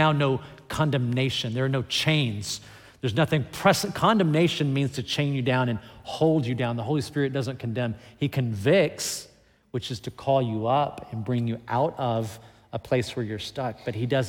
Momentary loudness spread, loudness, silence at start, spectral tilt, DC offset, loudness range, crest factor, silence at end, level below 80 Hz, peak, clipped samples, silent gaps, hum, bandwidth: 11 LU; -26 LUFS; 0 s; -5.5 dB/octave; under 0.1%; 4 LU; 20 dB; 0 s; -58 dBFS; -6 dBFS; under 0.1%; none; none; 17 kHz